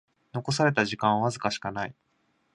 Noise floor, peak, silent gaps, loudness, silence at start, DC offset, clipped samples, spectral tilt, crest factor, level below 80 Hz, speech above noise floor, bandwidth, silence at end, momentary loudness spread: -71 dBFS; -8 dBFS; none; -27 LUFS; 0.35 s; under 0.1%; under 0.1%; -5 dB/octave; 22 dB; -62 dBFS; 44 dB; 11.5 kHz; 0.6 s; 12 LU